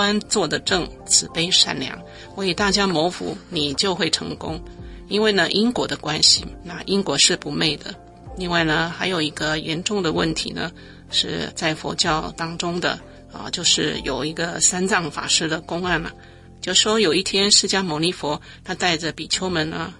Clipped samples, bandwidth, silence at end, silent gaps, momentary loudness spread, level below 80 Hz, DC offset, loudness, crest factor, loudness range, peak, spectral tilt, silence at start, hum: under 0.1%; 11.5 kHz; 0.05 s; none; 15 LU; -46 dBFS; under 0.1%; -20 LUFS; 22 dB; 4 LU; 0 dBFS; -2.5 dB/octave; 0 s; none